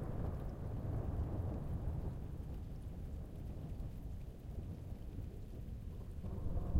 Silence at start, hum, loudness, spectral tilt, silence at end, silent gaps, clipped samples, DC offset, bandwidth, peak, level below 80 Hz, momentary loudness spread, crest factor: 0 s; none; -46 LUFS; -9 dB/octave; 0 s; none; under 0.1%; under 0.1%; 16 kHz; -22 dBFS; -46 dBFS; 8 LU; 20 dB